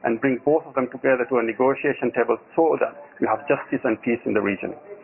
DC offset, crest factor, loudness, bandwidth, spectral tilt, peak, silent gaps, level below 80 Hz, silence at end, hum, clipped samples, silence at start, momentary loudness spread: under 0.1%; 16 dB; -23 LUFS; 3.1 kHz; -10.5 dB/octave; -6 dBFS; none; -64 dBFS; 0 s; none; under 0.1%; 0 s; 6 LU